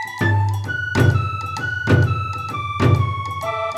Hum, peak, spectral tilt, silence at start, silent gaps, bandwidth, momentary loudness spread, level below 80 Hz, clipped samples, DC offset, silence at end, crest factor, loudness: none; -2 dBFS; -7 dB/octave; 0 s; none; 13 kHz; 7 LU; -44 dBFS; under 0.1%; under 0.1%; 0 s; 16 dB; -20 LUFS